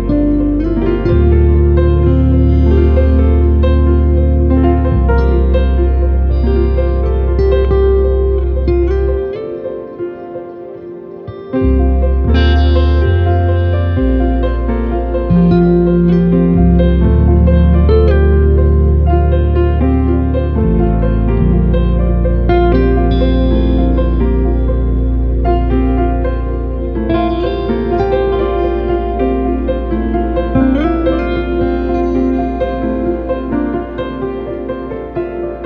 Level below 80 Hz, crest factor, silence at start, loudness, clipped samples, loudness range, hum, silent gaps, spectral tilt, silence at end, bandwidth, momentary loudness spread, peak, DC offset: -14 dBFS; 12 dB; 0 s; -13 LUFS; under 0.1%; 6 LU; none; none; -11 dB/octave; 0 s; 5 kHz; 10 LU; 0 dBFS; under 0.1%